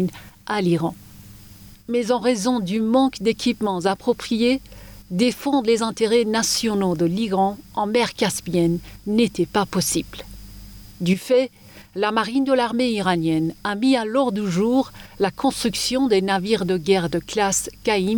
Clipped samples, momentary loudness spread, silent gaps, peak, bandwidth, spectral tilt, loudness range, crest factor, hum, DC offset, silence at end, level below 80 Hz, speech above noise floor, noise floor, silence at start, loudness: under 0.1%; 8 LU; none; -6 dBFS; over 20 kHz; -4.5 dB/octave; 2 LU; 16 dB; none; under 0.1%; 0 s; -48 dBFS; 23 dB; -44 dBFS; 0 s; -21 LUFS